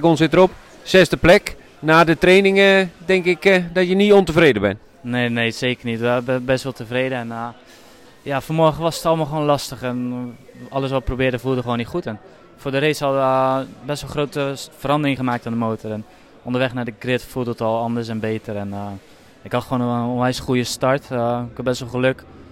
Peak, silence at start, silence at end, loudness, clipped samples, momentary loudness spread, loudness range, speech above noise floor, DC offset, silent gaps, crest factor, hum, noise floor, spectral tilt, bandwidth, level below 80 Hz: -4 dBFS; 0 s; 0.05 s; -19 LUFS; under 0.1%; 15 LU; 9 LU; 27 dB; under 0.1%; none; 16 dB; none; -45 dBFS; -5.5 dB/octave; 16.5 kHz; -42 dBFS